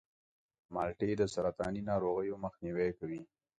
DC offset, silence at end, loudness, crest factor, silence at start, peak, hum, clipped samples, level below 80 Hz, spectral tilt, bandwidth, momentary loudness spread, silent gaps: under 0.1%; 0.35 s; -36 LUFS; 18 dB; 0.7 s; -20 dBFS; none; under 0.1%; -60 dBFS; -7 dB/octave; 9.6 kHz; 10 LU; none